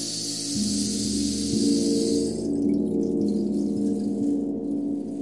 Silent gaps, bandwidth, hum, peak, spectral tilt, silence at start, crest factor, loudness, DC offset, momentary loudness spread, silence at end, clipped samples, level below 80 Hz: none; 11.5 kHz; none; -12 dBFS; -4.5 dB/octave; 0 s; 14 dB; -25 LUFS; 0.2%; 5 LU; 0 s; under 0.1%; -50 dBFS